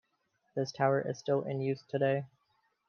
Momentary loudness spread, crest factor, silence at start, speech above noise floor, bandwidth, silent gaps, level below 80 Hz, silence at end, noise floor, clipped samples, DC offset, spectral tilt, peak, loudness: 8 LU; 20 dB; 0.55 s; 46 dB; 7.2 kHz; none; -82 dBFS; 0.6 s; -77 dBFS; under 0.1%; under 0.1%; -6.5 dB/octave; -14 dBFS; -33 LUFS